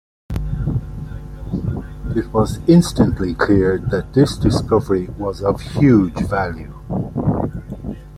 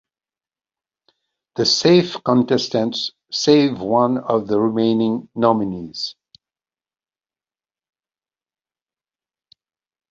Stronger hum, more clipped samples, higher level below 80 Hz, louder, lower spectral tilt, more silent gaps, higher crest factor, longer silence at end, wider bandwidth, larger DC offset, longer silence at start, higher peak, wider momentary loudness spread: neither; neither; first, -32 dBFS vs -60 dBFS; about the same, -18 LUFS vs -18 LUFS; first, -7.5 dB/octave vs -5 dB/octave; neither; about the same, 16 dB vs 20 dB; second, 0 s vs 4 s; first, 14 kHz vs 7.6 kHz; neither; second, 0.3 s vs 1.55 s; about the same, -2 dBFS vs -2 dBFS; first, 16 LU vs 11 LU